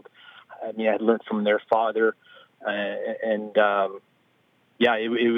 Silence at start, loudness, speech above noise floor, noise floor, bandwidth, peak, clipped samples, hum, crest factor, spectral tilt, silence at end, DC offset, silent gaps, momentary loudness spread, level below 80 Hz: 0.25 s; -24 LUFS; 41 dB; -64 dBFS; 5.2 kHz; -6 dBFS; under 0.1%; none; 20 dB; -7 dB/octave; 0 s; under 0.1%; none; 9 LU; -84 dBFS